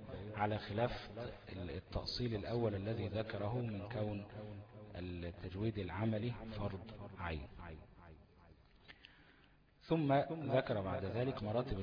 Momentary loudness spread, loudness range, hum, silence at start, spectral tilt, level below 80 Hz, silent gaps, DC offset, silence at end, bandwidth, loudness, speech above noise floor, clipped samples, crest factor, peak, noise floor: 17 LU; 7 LU; none; 0 s; -6 dB/octave; -58 dBFS; none; under 0.1%; 0 s; 5.2 kHz; -41 LUFS; 27 dB; under 0.1%; 20 dB; -22 dBFS; -68 dBFS